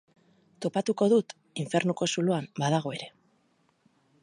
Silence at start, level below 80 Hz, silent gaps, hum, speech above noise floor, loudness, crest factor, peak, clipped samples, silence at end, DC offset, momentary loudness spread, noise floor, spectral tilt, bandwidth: 0.6 s; -76 dBFS; none; none; 42 dB; -28 LUFS; 18 dB; -12 dBFS; under 0.1%; 1.15 s; under 0.1%; 14 LU; -69 dBFS; -5.5 dB/octave; 11 kHz